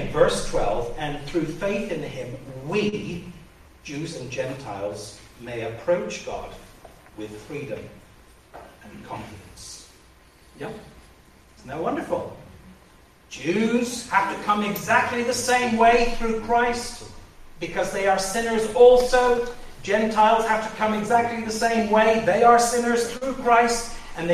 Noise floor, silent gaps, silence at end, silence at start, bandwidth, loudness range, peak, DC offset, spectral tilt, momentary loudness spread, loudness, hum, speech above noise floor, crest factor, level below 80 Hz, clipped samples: -52 dBFS; none; 0 s; 0 s; 14.5 kHz; 19 LU; -4 dBFS; under 0.1%; -4 dB/octave; 20 LU; -22 LUFS; none; 30 dB; 20 dB; -42 dBFS; under 0.1%